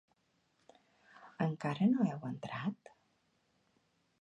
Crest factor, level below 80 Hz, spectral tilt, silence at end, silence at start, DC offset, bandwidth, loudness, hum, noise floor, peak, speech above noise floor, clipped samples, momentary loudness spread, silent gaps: 20 dB; -80 dBFS; -8 dB/octave; 1.45 s; 1.15 s; under 0.1%; 8.2 kHz; -36 LUFS; none; -77 dBFS; -20 dBFS; 42 dB; under 0.1%; 15 LU; none